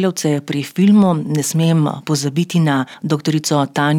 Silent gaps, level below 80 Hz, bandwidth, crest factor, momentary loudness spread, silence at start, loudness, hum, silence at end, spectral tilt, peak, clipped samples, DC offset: none; -66 dBFS; 16.5 kHz; 12 dB; 7 LU; 0 s; -16 LUFS; none; 0 s; -5.5 dB/octave; -4 dBFS; under 0.1%; under 0.1%